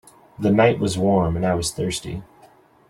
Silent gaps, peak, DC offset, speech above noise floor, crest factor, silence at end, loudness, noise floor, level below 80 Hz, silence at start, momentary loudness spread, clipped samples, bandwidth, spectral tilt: none; -4 dBFS; under 0.1%; 32 dB; 18 dB; 0.65 s; -20 LUFS; -52 dBFS; -44 dBFS; 0.4 s; 12 LU; under 0.1%; 14 kHz; -5.5 dB/octave